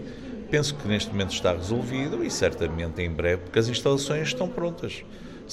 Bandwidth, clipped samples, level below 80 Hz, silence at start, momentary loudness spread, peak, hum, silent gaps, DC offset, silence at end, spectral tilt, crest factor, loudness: 13.5 kHz; under 0.1%; -44 dBFS; 0 s; 11 LU; -8 dBFS; none; none; under 0.1%; 0 s; -5 dB/octave; 18 dB; -26 LUFS